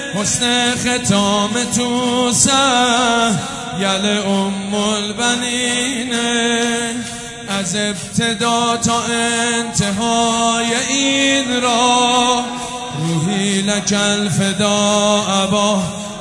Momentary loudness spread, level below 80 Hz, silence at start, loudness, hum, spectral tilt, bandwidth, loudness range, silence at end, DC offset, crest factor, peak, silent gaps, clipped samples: 7 LU; -48 dBFS; 0 s; -15 LUFS; none; -3 dB/octave; 11.5 kHz; 3 LU; 0 s; under 0.1%; 16 dB; 0 dBFS; none; under 0.1%